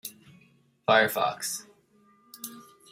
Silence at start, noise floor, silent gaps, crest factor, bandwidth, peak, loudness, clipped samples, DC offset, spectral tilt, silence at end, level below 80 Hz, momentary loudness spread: 0.05 s; -62 dBFS; none; 24 dB; 16 kHz; -6 dBFS; -26 LUFS; under 0.1%; under 0.1%; -2.5 dB/octave; 0.3 s; -76 dBFS; 20 LU